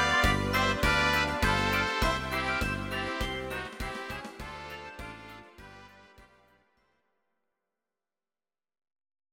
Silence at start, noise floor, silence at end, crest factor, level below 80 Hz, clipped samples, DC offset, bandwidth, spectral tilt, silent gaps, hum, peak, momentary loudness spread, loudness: 0 s; under -90 dBFS; 3.1 s; 20 dB; -42 dBFS; under 0.1%; under 0.1%; 16.5 kHz; -4 dB/octave; none; none; -12 dBFS; 19 LU; -28 LUFS